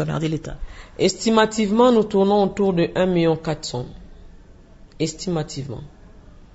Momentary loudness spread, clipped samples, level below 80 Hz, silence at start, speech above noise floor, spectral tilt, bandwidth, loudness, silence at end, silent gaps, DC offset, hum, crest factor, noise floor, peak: 18 LU; under 0.1%; -42 dBFS; 0 s; 25 dB; -5.5 dB/octave; 8 kHz; -20 LUFS; 0.35 s; none; under 0.1%; none; 20 dB; -45 dBFS; -2 dBFS